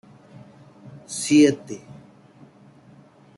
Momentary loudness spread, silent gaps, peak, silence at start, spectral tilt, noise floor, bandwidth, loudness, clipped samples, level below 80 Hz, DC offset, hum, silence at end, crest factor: 22 LU; none; -6 dBFS; 0.95 s; -4.5 dB/octave; -51 dBFS; 12 kHz; -20 LUFS; under 0.1%; -68 dBFS; under 0.1%; none; 1.6 s; 20 dB